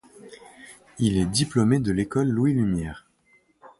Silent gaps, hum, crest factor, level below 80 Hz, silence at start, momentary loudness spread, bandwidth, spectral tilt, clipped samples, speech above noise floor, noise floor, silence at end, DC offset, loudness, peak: none; none; 18 dB; -46 dBFS; 0.25 s; 23 LU; 11.5 kHz; -6 dB/octave; under 0.1%; 40 dB; -63 dBFS; 0.1 s; under 0.1%; -23 LUFS; -8 dBFS